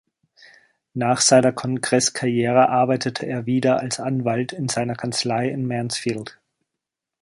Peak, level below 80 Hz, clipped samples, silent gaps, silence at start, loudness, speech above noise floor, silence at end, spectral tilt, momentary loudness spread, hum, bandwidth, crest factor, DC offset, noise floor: -4 dBFS; -62 dBFS; under 0.1%; none; 0.95 s; -21 LUFS; 64 dB; 0.9 s; -4 dB/octave; 9 LU; none; 11.5 kHz; 18 dB; under 0.1%; -84 dBFS